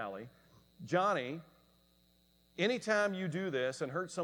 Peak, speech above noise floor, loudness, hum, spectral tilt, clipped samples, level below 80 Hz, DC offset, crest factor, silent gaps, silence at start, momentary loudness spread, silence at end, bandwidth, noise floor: -18 dBFS; 35 dB; -35 LUFS; none; -5 dB/octave; under 0.1%; -76 dBFS; under 0.1%; 20 dB; none; 0 s; 18 LU; 0 s; 19.5 kHz; -70 dBFS